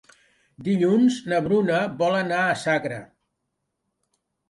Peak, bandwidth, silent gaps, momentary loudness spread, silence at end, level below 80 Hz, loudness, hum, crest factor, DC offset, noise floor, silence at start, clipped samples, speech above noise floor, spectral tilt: -10 dBFS; 11.5 kHz; none; 10 LU; 1.45 s; -64 dBFS; -22 LUFS; none; 14 dB; under 0.1%; -78 dBFS; 0.6 s; under 0.1%; 57 dB; -6 dB/octave